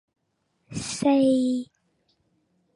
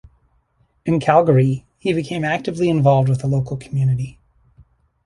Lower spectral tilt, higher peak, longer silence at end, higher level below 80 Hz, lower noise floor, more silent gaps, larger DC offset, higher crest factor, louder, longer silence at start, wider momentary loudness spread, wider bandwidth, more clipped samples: second, -5 dB/octave vs -8 dB/octave; second, -10 dBFS vs -2 dBFS; first, 1.1 s vs 0.95 s; second, -62 dBFS vs -50 dBFS; first, -74 dBFS vs -62 dBFS; neither; neither; about the same, 16 dB vs 18 dB; second, -23 LUFS vs -18 LUFS; second, 0.7 s vs 0.85 s; first, 17 LU vs 10 LU; about the same, 11.5 kHz vs 11 kHz; neither